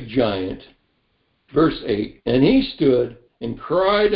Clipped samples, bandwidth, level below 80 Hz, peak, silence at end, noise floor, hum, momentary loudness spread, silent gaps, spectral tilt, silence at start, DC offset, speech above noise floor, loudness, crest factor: under 0.1%; 5.4 kHz; -44 dBFS; -4 dBFS; 0 s; -67 dBFS; none; 14 LU; none; -11.5 dB/octave; 0 s; under 0.1%; 48 dB; -20 LUFS; 16 dB